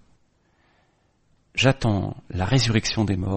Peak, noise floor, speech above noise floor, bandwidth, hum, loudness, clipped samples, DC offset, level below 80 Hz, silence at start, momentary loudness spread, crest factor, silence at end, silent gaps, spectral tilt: -2 dBFS; -64 dBFS; 43 dB; 8.8 kHz; none; -23 LUFS; under 0.1%; under 0.1%; -44 dBFS; 1.55 s; 10 LU; 22 dB; 0 s; none; -5 dB/octave